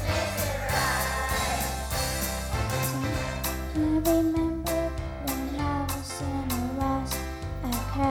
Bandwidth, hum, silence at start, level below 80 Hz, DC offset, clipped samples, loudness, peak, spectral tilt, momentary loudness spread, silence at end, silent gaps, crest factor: 19.5 kHz; none; 0 s; -36 dBFS; under 0.1%; under 0.1%; -28 LUFS; -12 dBFS; -4.5 dB/octave; 7 LU; 0 s; none; 16 dB